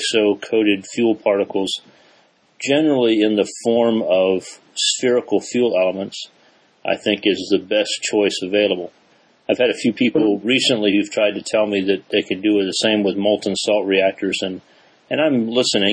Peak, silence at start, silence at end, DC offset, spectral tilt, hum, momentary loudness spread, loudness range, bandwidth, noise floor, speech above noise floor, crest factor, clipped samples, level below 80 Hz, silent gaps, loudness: -2 dBFS; 0 s; 0 s; under 0.1%; -3.5 dB/octave; none; 8 LU; 2 LU; 10 kHz; -56 dBFS; 38 dB; 18 dB; under 0.1%; -64 dBFS; none; -18 LUFS